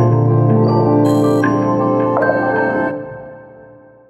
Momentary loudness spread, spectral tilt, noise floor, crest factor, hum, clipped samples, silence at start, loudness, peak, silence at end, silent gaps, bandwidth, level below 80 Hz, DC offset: 9 LU; -9 dB/octave; -42 dBFS; 14 dB; none; under 0.1%; 0 s; -14 LUFS; 0 dBFS; 0.5 s; none; 12 kHz; -52 dBFS; under 0.1%